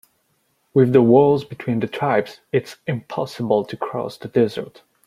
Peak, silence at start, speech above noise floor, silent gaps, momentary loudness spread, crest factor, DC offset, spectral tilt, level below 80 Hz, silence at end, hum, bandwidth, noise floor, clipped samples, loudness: -2 dBFS; 0.75 s; 47 dB; none; 14 LU; 18 dB; under 0.1%; -8 dB/octave; -60 dBFS; 0.4 s; none; 13.5 kHz; -66 dBFS; under 0.1%; -20 LUFS